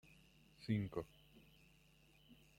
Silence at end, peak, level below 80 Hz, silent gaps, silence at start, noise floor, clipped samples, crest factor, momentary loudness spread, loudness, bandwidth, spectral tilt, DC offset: 0.25 s; -26 dBFS; -70 dBFS; none; 0.1 s; -70 dBFS; under 0.1%; 24 dB; 26 LU; -45 LUFS; 16.5 kHz; -8 dB/octave; under 0.1%